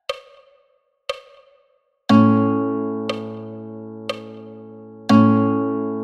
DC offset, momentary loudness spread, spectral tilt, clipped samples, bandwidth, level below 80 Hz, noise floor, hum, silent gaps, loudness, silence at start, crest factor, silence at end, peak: under 0.1%; 22 LU; -7.5 dB/octave; under 0.1%; 8.6 kHz; -64 dBFS; -63 dBFS; none; none; -19 LUFS; 0.1 s; 18 dB; 0 s; -2 dBFS